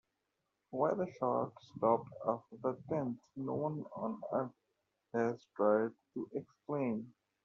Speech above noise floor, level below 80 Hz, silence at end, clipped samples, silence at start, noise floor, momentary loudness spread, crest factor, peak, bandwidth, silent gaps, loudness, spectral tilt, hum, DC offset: 49 dB; -80 dBFS; 0.35 s; under 0.1%; 0.7 s; -85 dBFS; 11 LU; 20 dB; -16 dBFS; 7 kHz; none; -38 LUFS; -8 dB/octave; none; under 0.1%